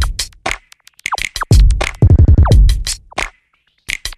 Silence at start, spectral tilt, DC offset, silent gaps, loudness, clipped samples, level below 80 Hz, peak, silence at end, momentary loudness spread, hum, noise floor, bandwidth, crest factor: 0 s; -5 dB/octave; under 0.1%; none; -14 LUFS; under 0.1%; -14 dBFS; 0 dBFS; 0.05 s; 14 LU; none; -60 dBFS; 13.5 kHz; 12 dB